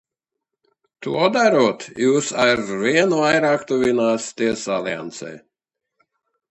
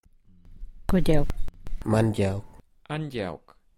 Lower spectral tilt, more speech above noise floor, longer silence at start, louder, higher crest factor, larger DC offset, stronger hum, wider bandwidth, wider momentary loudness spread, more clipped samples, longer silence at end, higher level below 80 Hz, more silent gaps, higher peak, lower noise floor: second, -4 dB/octave vs -7.5 dB/octave; first, 64 dB vs 31 dB; first, 1 s vs 0.5 s; first, -19 LUFS vs -28 LUFS; about the same, 20 dB vs 18 dB; neither; neither; second, 10.5 kHz vs 12.5 kHz; second, 12 LU vs 16 LU; neither; first, 1.15 s vs 0.4 s; second, -60 dBFS vs -34 dBFS; neither; first, -2 dBFS vs -8 dBFS; first, -83 dBFS vs -53 dBFS